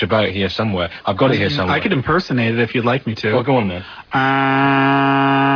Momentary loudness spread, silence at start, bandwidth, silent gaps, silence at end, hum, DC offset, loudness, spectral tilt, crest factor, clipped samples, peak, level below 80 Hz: 6 LU; 0 s; 5.4 kHz; none; 0 s; none; under 0.1%; -16 LUFS; -7.5 dB/octave; 14 dB; under 0.1%; -2 dBFS; -46 dBFS